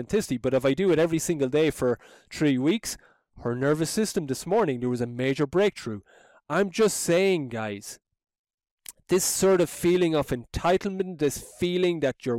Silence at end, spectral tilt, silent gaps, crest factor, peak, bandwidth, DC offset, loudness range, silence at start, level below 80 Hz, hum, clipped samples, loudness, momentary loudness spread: 0 s; -5 dB/octave; 8.39-8.44 s, 8.54-8.58 s, 8.71-8.78 s; 12 dB; -14 dBFS; 17 kHz; under 0.1%; 2 LU; 0 s; -52 dBFS; none; under 0.1%; -25 LUFS; 13 LU